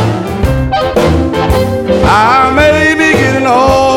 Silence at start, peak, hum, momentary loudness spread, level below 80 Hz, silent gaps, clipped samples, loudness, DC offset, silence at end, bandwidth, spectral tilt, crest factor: 0 s; 0 dBFS; none; 6 LU; -22 dBFS; none; under 0.1%; -9 LUFS; under 0.1%; 0 s; 17.5 kHz; -5.5 dB/octave; 8 dB